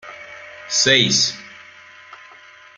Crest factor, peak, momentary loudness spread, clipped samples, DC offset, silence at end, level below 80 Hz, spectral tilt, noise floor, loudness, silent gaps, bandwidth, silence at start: 22 dB; 0 dBFS; 23 LU; under 0.1%; under 0.1%; 0.6 s; -62 dBFS; -1.5 dB/octave; -45 dBFS; -15 LUFS; none; 13 kHz; 0.05 s